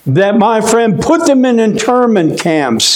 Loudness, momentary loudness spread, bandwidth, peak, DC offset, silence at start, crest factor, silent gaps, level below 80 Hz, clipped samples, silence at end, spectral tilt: -10 LUFS; 3 LU; 17 kHz; 0 dBFS; under 0.1%; 0.05 s; 10 dB; none; -46 dBFS; under 0.1%; 0 s; -4.5 dB/octave